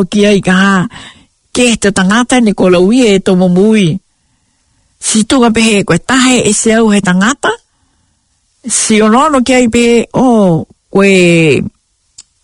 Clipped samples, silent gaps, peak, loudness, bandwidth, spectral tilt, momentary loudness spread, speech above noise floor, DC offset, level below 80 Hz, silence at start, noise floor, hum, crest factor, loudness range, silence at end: 0.5%; none; 0 dBFS; -8 LUFS; 11 kHz; -4.5 dB/octave; 7 LU; 49 dB; under 0.1%; -40 dBFS; 0 s; -57 dBFS; none; 10 dB; 2 LU; 0.2 s